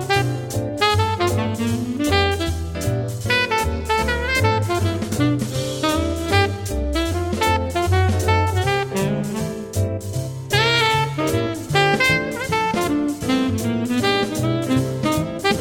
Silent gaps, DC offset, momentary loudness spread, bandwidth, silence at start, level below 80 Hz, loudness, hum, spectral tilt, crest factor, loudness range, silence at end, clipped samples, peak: none; under 0.1%; 6 LU; 17.5 kHz; 0 s; -34 dBFS; -20 LUFS; none; -5 dB/octave; 18 dB; 2 LU; 0 s; under 0.1%; -2 dBFS